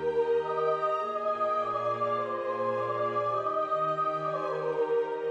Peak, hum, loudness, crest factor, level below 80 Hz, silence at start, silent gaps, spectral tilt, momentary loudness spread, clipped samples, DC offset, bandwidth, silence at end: -16 dBFS; none; -29 LUFS; 12 dB; -72 dBFS; 0 s; none; -6.5 dB/octave; 3 LU; under 0.1%; under 0.1%; 8 kHz; 0 s